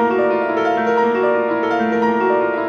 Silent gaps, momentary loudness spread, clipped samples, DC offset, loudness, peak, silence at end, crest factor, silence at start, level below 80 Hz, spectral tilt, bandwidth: none; 2 LU; under 0.1%; under 0.1%; -17 LUFS; -4 dBFS; 0 s; 12 dB; 0 s; -60 dBFS; -6.5 dB/octave; 7 kHz